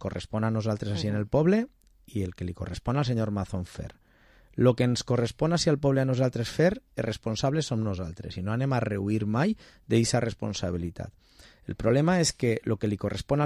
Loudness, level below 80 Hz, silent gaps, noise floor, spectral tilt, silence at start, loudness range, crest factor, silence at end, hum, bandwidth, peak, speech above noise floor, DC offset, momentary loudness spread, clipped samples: -28 LUFS; -48 dBFS; none; -59 dBFS; -6 dB/octave; 0 s; 3 LU; 18 dB; 0 s; none; 13.5 kHz; -10 dBFS; 32 dB; under 0.1%; 12 LU; under 0.1%